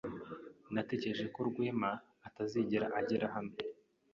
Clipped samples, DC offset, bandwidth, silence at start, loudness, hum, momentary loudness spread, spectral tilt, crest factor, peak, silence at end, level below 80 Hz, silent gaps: under 0.1%; under 0.1%; 7.4 kHz; 0.05 s; -38 LUFS; none; 12 LU; -5 dB/octave; 18 dB; -20 dBFS; 0.4 s; -72 dBFS; none